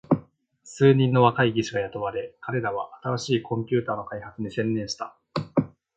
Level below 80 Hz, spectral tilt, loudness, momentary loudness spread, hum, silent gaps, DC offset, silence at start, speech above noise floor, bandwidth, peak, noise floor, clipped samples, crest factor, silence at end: -60 dBFS; -6.5 dB/octave; -25 LUFS; 14 LU; none; none; under 0.1%; 0.1 s; 29 dB; 8.6 kHz; -4 dBFS; -53 dBFS; under 0.1%; 20 dB; 0.3 s